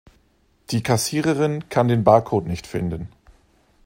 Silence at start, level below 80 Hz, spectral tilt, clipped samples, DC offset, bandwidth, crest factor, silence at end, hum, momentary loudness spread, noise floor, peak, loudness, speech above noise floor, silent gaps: 0.7 s; -50 dBFS; -6 dB/octave; under 0.1%; under 0.1%; 16 kHz; 22 dB; 0.8 s; none; 12 LU; -61 dBFS; 0 dBFS; -21 LUFS; 41 dB; none